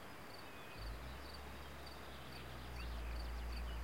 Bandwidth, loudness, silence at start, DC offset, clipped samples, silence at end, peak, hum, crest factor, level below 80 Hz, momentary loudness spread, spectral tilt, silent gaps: 16.5 kHz; -50 LUFS; 0 s; 0.1%; under 0.1%; 0 s; -36 dBFS; none; 12 dB; -50 dBFS; 6 LU; -5 dB/octave; none